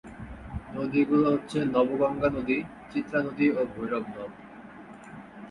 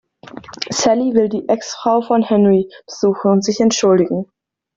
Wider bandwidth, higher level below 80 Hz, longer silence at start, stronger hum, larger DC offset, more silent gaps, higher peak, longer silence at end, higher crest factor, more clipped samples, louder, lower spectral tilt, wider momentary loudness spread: first, 11 kHz vs 7.8 kHz; about the same, -52 dBFS vs -56 dBFS; second, 0.05 s vs 0.35 s; neither; neither; neither; second, -10 dBFS vs -2 dBFS; second, 0 s vs 0.55 s; first, 20 dB vs 14 dB; neither; second, -27 LUFS vs -16 LUFS; first, -7.5 dB/octave vs -5 dB/octave; first, 21 LU vs 14 LU